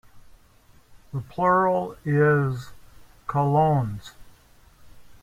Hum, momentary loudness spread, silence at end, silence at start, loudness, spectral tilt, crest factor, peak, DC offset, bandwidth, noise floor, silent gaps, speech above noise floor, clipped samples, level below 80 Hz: none; 16 LU; 0.1 s; 0.15 s; -23 LUFS; -8.5 dB/octave; 18 dB; -8 dBFS; under 0.1%; 13 kHz; -55 dBFS; none; 33 dB; under 0.1%; -54 dBFS